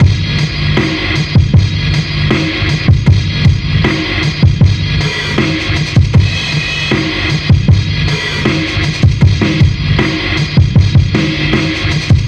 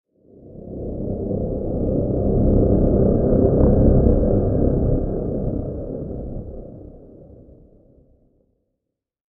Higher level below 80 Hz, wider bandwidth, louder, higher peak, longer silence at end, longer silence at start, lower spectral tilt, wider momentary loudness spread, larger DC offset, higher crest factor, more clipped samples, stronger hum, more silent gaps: about the same, -22 dBFS vs -26 dBFS; first, 8.8 kHz vs 1.8 kHz; first, -12 LUFS vs -20 LUFS; about the same, 0 dBFS vs -2 dBFS; second, 0 s vs 2.1 s; second, 0 s vs 0.45 s; second, -6 dB/octave vs -15 dB/octave; second, 4 LU vs 18 LU; neither; second, 10 dB vs 18 dB; first, 1% vs under 0.1%; neither; neither